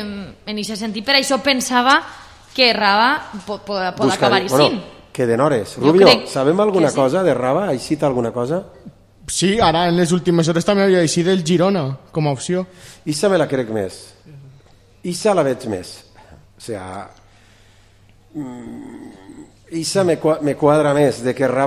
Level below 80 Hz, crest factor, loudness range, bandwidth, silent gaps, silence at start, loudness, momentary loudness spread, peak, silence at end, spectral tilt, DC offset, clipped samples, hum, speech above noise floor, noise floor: -50 dBFS; 18 dB; 10 LU; 15.5 kHz; none; 0 s; -17 LUFS; 17 LU; 0 dBFS; 0 s; -4.5 dB/octave; under 0.1%; under 0.1%; none; 33 dB; -50 dBFS